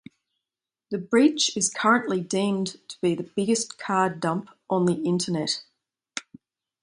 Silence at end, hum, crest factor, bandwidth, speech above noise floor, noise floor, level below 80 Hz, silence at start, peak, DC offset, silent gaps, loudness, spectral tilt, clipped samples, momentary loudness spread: 0.6 s; none; 20 dB; 11 kHz; 65 dB; -89 dBFS; -70 dBFS; 0.9 s; -6 dBFS; under 0.1%; none; -25 LUFS; -4 dB/octave; under 0.1%; 13 LU